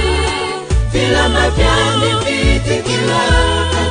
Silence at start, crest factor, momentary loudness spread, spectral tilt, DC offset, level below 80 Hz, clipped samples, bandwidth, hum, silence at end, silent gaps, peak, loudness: 0 s; 12 dB; 5 LU; -4.5 dB/octave; under 0.1%; -20 dBFS; under 0.1%; 10 kHz; none; 0 s; none; 0 dBFS; -14 LUFS